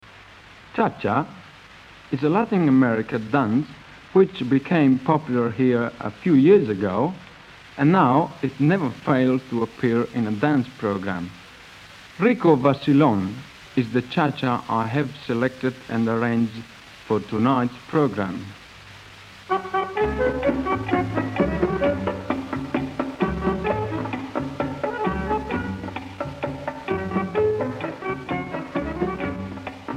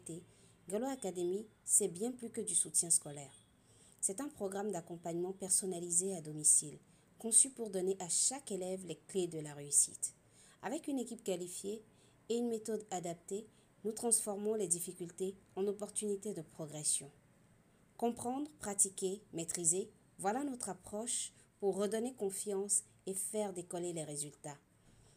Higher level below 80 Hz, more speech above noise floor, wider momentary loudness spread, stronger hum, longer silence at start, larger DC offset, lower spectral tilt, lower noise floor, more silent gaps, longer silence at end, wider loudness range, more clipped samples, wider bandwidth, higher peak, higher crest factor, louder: first, -46 dBFS vs -78 dBFS; second, 26 dB vs 30 dB; about the same, 16 LU vs 14 LU; neither; about the same, 0.1 s vs 0.05 s; neither; first, -8 dB/octave vs -3 dB/octave; second, -46 dBFS vs -68 dBFS; neither; second, 0 s vs 0.6 s; about the same, 6 LU vs 7 LU; neither; second, 9.8 kHz vs 15.5 kHz; first, -4 dBFS vs -14 dBFS; second, 18 dB vs 26 dB; first, -23 LUFS vs -36 LUFS